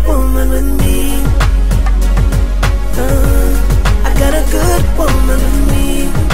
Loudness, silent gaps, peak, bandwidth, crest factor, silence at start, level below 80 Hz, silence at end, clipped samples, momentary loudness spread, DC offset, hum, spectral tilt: -14 LUFS; none; 0 dBFS; 16.5 kHz; 10 dB; 0 s; -12 dBFS; 0 s; under 0.1%; 2 LU; 20%; none; -5.5 dB/octave